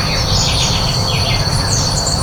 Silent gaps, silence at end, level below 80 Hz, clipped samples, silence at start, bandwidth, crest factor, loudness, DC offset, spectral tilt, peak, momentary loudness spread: none; 0 s; -24 dBFS; under 0.1%; 0 s; over 20 kHz; 14 dB; -14 LUFS; under 0.1%; -3 dB/octave; -2 dBFS; 2 LU